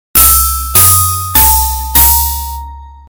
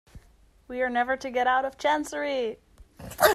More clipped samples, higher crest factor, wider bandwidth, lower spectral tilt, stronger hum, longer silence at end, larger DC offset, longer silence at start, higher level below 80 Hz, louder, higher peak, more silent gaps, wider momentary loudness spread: first, 2% vs under 0.1%; second, 10 dB vs 22 dB; first, over 20 kHz vs 15 kHz; about the same, -1.5 dB/octave vs -2.5 dB/octave; neither; first, 0.15 s vs 0 s; neither; about the same, 0.15 s vs 0.15 s; first, -20 dBFS vs -54 dBFS; first, -6 LUFS vs -27 LUFS; first, 0 dBFS vs -4 dBFS; neither; second, 12 LU vs 17 LU